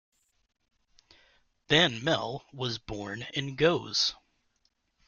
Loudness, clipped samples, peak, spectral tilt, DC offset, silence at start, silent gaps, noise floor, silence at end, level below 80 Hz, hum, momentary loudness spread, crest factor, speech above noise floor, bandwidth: -28 LUFS; under 0.1%; -10 dBFS; -4 dB/octave; under 0.1%; 1.7 s; none; -75 dBFS; 0.95 s; -60 dBFS; none; 13 LU; 24 dB; 46 dB; 7.4 kHz